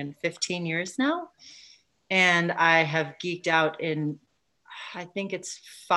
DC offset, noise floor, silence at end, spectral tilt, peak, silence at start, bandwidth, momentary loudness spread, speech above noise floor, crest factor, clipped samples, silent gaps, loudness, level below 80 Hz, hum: under 0.1%; -56 dBFS; 0 s; -4 dB/octave; -8 dBFS; 0 s; 12.5 kHz; 19 LU; 30 dB; 20 dB; under 0.1%; none; -25 LUFS; -76 dBFS; none